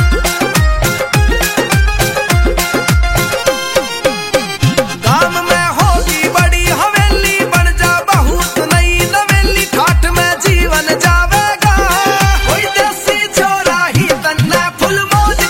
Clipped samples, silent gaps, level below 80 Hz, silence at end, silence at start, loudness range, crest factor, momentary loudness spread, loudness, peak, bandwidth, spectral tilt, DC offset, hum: under 0.1%; none; -18 dBFS; 0 s; 0 s; 2 LU; 12 dB; 3 LU; -11 LUFS; 0 dBFS; 16.5 kHz; -4 dB/octave; under 0.1%; none